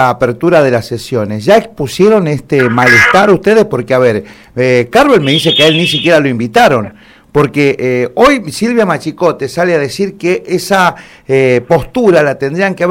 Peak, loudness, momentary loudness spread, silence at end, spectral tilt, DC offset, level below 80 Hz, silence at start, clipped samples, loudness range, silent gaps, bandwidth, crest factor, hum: 0 dBFS; -10 LUFS; 8 LU; 0 s; -5 dB/octave; under 0.1%; -40 dBFS; 0 s; 0.6%; 3 LU; none; 16.5 kHz; 10 dB; none